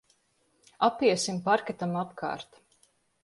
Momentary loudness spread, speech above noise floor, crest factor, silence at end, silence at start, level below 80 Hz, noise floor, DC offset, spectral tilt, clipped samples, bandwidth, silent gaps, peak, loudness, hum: 11 LU; 43 dB; 20 dB; 0.8 s; 0.8 s; -72 dBFS; -71 dBFS; under 0.1%; -4.5 dB/octave; under 0.1%; 11.5 kHz; none; -10 dBFS; -28 LUFS; none